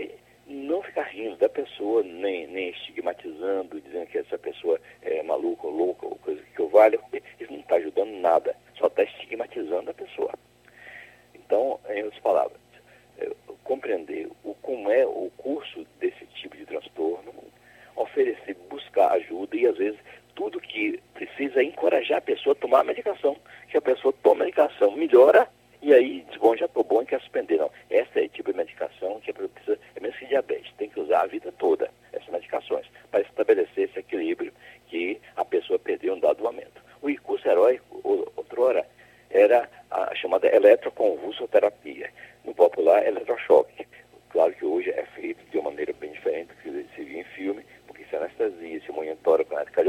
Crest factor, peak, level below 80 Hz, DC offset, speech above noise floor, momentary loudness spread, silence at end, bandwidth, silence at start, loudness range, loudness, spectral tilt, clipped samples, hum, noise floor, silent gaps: 22 dB; -4 dBFS; -70 dBFS; under 0.1%; 30 dB; 16 LU; 0 s; 12.5 kHz; 0 s; 9 LU; -25 LUFS; -5 dB/octave; under 0.1%; 60 Hz at -65 dBFS; -55 dBFS; none